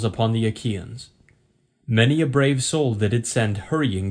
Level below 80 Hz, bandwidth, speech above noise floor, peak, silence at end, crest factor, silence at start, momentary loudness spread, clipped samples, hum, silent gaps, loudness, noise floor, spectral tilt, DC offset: -52 dBFS; 10.5 kHz; 43 dB; -4 dBFS; 0 s; 18 dB; 0 s; 12 LU; under 0.1%; none; none; -22 LUFS; -64 dBFS; -5.5 dB/octave; under 0.1%